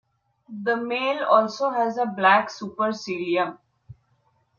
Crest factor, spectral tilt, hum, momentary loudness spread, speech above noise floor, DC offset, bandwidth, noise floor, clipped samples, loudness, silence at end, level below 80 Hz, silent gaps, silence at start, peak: 22 dB; -4.5 dB/octave; none; 11 LU; 44 dB; under 0.1%; 7.4 kHz; -67 dBFS; under 0.1%; -23 LUFS; 0.65 s; -72 dBFS; none; 0.5 s; -4 dBFS